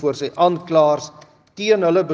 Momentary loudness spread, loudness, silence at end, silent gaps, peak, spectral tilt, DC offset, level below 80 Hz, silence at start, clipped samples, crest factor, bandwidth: 9 LU; -18 LUFS; 0 s; none; -2 dBFS; -5.5 dB/octave; under 0.1%; -66 dBFS; 0 s; under 0.1%; 16 dB; 7.8 kHz